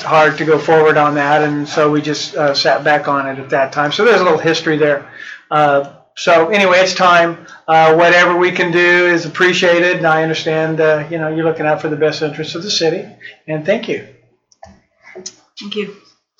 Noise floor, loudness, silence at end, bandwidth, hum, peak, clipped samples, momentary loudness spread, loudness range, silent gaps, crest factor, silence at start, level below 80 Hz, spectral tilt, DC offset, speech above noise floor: -45 dBFS; -13 LUFS; 0.45 s; 8 kHz; none; -2 dBFS; under 0.1%; 14 LU; 9 LU; none; 12 dB; 0 s; -64 dBFS; -4.5 dB/octave; under 0.1%; 32 dB